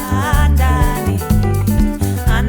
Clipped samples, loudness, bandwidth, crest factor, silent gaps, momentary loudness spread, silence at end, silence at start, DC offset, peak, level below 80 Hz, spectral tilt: under 0.1%; -15 LUFS; over 20 kHz; 10 dB; none; 4 LU; 0 s; 0 s; under 0.1%; -2 dBFS; -18 dBFS; -6.5 dB/octave